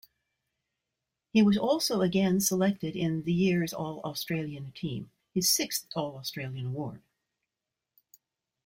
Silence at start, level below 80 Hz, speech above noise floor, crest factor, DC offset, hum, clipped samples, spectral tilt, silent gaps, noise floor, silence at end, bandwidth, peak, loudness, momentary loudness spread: 1.35 s; -64 dBFS; 60 dB; 20 dB; under 0.1%; none; under 0.1%; -4.5 dB/octave; none; -88 dBFS; 1.65 s; 16 kHz; -10 dBFS; -29 LUFS; 12 LU